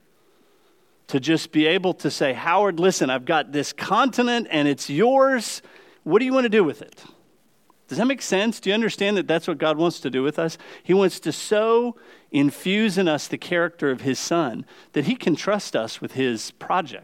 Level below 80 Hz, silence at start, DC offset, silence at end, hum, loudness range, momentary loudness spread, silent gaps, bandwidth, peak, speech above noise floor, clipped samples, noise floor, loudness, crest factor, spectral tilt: -76 dBFS; 1.1 s; under 0.1%; 0.05 s; none; 3 LU; 8 LU; none; 16.5 kHz; -6 dBFS; 39 dB; under 0.1%; -61 dBFS; -22 LUFS; 16 dB; -4.5 dB/octave